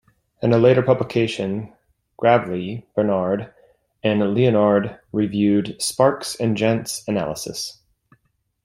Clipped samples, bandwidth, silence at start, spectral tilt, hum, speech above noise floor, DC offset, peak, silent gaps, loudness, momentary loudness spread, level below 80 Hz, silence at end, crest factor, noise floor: under 0.1%; 16 kHz; 0.4 s; -5.5 dB/octave; none; 48 dB; under 0.1%; -2 dBFS; none; -20 LUFS; 11 LU; -56 dBFS; 0.9 s; 18 dB; -67 dBFS